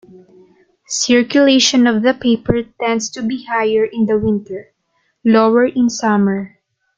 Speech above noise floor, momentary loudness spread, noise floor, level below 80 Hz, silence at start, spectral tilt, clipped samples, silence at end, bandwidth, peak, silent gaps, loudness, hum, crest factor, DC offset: 51 dB; 11 LU; -65 dBFS; -48 dBFS; 0.9 s; -4 dB/octave; under 0.1%; 0.5 s; 9 kHz; 0 dBFS; none; -15 LUFS; none; 16 dB; under 0.1%